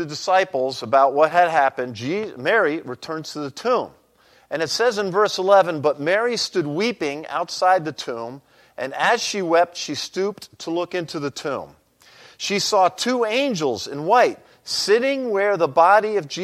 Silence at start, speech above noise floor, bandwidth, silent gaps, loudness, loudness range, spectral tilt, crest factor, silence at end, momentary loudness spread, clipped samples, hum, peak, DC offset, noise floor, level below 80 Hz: 0 s; 36 dB; 14.5 kHz; none; -20 LUFS; 4 LU; -3.5 dB/octave; 18 dB; 0 s; 13 LU; under 0.1%; none; -2 dBFS; under 0.1%; -56 dBFS; -70 dBFS